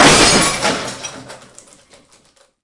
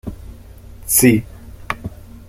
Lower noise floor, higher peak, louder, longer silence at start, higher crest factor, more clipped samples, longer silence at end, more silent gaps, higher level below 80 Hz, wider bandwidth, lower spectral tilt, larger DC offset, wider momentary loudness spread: first, -53 dBFS vs -38 dBFS; about the same, 0 dBFS vs 0 dBFS; first, -12 LUFS vs -16 LUFS; about the same, 0 s vs 0.05 s; about the same, 16 dB vs 20 dB; neither; first, 1.3 s vs 0.1 s; neither; about the same, -38 dBFS vs -38 dBFS; second, 12 kHz vs 16 kHz; second, -2 dB/octave vs -4.5 dB/octave; neither; second, 21 LU vs 24 LU